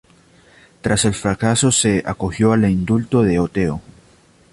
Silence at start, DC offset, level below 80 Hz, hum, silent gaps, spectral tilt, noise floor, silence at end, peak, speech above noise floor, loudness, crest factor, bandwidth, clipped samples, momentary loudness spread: 0.85 s; under 0.1%; -40 dBFS; none; none; -5 dB/octave; -51 dBFS; 0.75 s; -2 dBFS; 35 dB; -17 LUFS; 16 dB; 11.5 kHz; under 0.1%; 8 LU